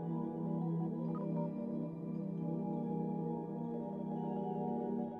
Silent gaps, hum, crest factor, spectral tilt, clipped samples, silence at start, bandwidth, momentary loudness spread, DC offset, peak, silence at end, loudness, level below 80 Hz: none; none; 12 dB; -12 dB/octave; under 0.1%; 0 s; 3.5 kHz; 3 LU; under 0.1%; -26 dBFS; 0 s; -40 LUFS; -74 dBFS